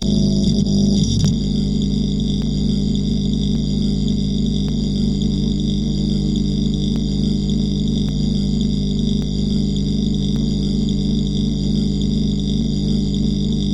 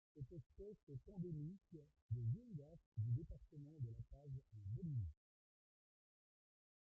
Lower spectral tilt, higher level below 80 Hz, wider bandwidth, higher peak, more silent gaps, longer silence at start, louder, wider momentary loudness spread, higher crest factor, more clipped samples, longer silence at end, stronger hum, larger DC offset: second, -7 dB/octave vs -13.5 dB/octave; first, -26 dBFS vs -68 dBFS; first, 10.5 kHz vs 0.9 kHz; first, -4 dBFS vs -34 dBFS; second, none vs 0.46-0.50 s, 0.83-0.87 s, 2.02-2.09 s, 2.86-2.92 s; second, 0 s vs 0.15 s; first, -19 LUFS vs -51 LUFS; second, 3 LU vs 14 LU; about the same, 14 dB vs 16 dB; neither; second, 0 s vs 1.85 s; first, 50 Hz at -25 dBFS vs none; first, 1% vs under 0.1%